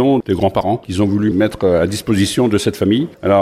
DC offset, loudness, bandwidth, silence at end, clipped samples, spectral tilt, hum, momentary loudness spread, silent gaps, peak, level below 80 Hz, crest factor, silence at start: under 0.1%; -16 LUFS; 15 kHz; 0 s; under 0.1%; -6 dB/octave; none; 2 LU; none; -2 dBFS; -42 dBFS; 14 dB; 0 s